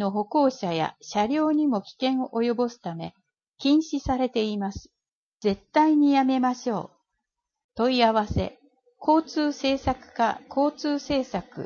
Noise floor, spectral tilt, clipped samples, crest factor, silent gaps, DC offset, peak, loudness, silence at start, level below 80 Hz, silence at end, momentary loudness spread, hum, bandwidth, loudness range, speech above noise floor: -83 dBFS; -6 dB/octave; under 0.1%; 16 dB; 5.12-5.38 s, 7.64-7.69 s; under 0.1%; -8 dBFS; -25 LUFS; 0 s; -50 dBFS; 0 s; 12 LU; none; 7.2 kHz; 3 LU; 59 dB